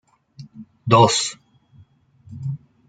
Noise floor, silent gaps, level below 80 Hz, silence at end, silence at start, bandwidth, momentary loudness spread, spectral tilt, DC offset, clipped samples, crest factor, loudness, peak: -53 dBFS; none; -58 dBFS; 0.35 s; 0.4 s; 9.4 kHz; 19 LU; -4.5 dB/octave; under 0.1%; under 0.1%; 22 dB; -18 LUFS; -2 dBFS